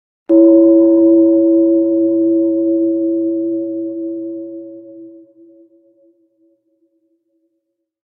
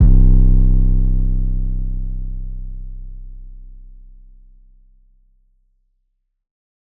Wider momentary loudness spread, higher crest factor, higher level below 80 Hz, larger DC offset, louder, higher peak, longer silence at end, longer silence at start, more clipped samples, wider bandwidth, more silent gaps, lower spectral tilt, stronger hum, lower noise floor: second, 18 LU vs 24 LU; about the same, 14 dB vs 14 dB; second, -72 dBFS vs -16 dBFS; neither; first, -13 LUFS vs -20 LUFS; about the same, 0 dBFS vs -2 dBFS; about the same, 3 s vs 3.05 s; first, 0.3 s vs 0 s; neither; about the same, 1.1 kHz vs 1.1 kHz; neither; about the same, -13 dB/octave vs -13.5 dB/octave; neither; about the same, -72 dBFS vs -69 dBFS